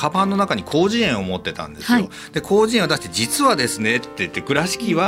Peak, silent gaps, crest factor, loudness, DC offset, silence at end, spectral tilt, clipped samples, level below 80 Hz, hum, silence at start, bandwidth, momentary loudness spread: 0 dBFS; none; 18 dB; -19 LUFS; under 0.1%; 0 s; -4 dB/octave; under 0.1%; -50 dBFS; none; 0 s; 16 kHz; 9 LU